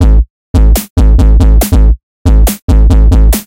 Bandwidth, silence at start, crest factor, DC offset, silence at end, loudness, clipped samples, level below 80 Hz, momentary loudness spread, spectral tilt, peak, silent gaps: 16.5 kHz; 0 s; 6 dB; under 0.1%; 0.05 s; -9 LUFS; 9%; -6 dBFS; 5 LU; -6.5 dB/octave; 0 dBFS; 0.30-0.54 s, 0.90-0.96 s, 2.03-2.25 s, 2.62-2.68 s